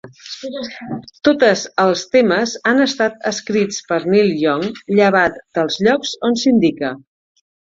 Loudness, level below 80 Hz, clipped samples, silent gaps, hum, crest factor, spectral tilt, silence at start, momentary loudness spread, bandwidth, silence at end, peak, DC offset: -16 LUFS; -58 dBFS; under 0.1%; none; none; 16 dB; -4.5 dB/octave; 0.05 s; 13 LU; 7.8 kHz; 0.7 s; -2 dBFS; under 0.1%